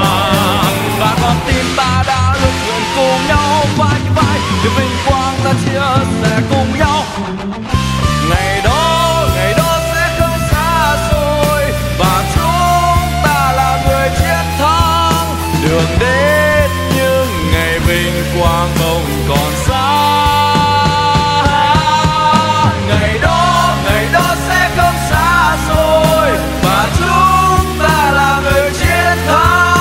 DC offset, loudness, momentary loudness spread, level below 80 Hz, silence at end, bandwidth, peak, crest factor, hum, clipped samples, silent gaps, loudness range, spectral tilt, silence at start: under 0.1%; -12 LUFS; 4 LU; -22 dBFS; 0 s; 16.5 kHz; 0 dBFS; 12 dB; none; under 0.1%; none; 2 LU; -4.5 dB/octave; 0 s